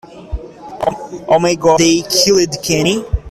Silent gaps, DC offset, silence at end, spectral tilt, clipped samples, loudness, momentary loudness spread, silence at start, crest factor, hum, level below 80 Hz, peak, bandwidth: none; under 0.1%; 0 s; -3.5 dB/octave; under 0.1%; -13 LUFS; 18 LU; 0.1 s; 14 dB; none; -30 dBFS; 0 dBFS; 14.5 kHz